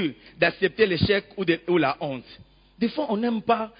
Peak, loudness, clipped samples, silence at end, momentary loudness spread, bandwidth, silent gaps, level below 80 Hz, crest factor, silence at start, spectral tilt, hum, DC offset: -8 dBFS; -24 LUFS; under 0.1%; 0.1 s; 9 LU; 5.2 kHz; none; -50 dBFS; 18 dB; 0 s; -10.5 dB/octave; none; under 0.1%